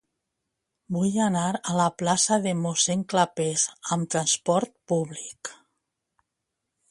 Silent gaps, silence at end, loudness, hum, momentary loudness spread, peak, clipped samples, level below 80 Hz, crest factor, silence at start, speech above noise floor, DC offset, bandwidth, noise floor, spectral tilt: none; 1.35 s; -25 LUFS; none; 10 LU; -6 dBFS; under 0.1%; -66 dBFS; 20 dB; 0.9 s; 57 dB; under 0.1%; 11.5 kHz; -83 dBFS; -4 dB/octave